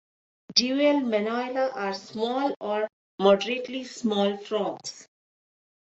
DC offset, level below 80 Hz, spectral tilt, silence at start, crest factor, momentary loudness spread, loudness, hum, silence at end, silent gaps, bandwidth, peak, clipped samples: under 0.1%; -72 dBFS; -4 dB/octave; 0.5 s; 22 dB; 10 LU; -26 LUFS; none; 0.9 s; 2.93-3.18 s; 8.2 kHz; -6 dBFS; under 0.1%